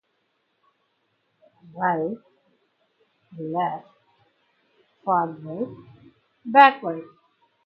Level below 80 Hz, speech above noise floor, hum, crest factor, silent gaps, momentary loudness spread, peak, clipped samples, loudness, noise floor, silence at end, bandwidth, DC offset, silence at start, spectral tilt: -76 dBFS; 50 dB; none; 26 dB; none; 23 LU; 0 dBFS; under 0.1%; -22 LUFS; -72 dBFS; 0.6 s; 5.6 kHz; under 0.1%; 1.75 s; -7.5 dB/octave